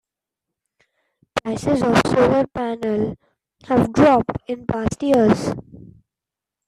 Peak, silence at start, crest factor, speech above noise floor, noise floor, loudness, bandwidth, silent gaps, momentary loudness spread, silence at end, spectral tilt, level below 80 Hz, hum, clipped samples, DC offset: -2 dBFS; 1.35 s; 18 dB; 69 dB; -87 dBFS; -19 LUFS; 13.5 kHz; none; 12 LU; 1.05 s; -6.5 dB/octave; -46 dBFS; none; under 0.1%; under 0.1%